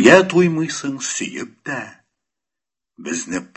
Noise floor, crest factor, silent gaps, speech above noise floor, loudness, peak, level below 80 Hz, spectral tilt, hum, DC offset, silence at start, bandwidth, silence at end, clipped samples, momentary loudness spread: -88 dBFS; 18 dB; none; 69 dB; -19 LUFS; 0 dBFS; -58 dBFS; -4.5 dB/octave; none; under 0.1%; 0 s; 8.6 kHz; 0.1 s; under 0.1%; 17 LU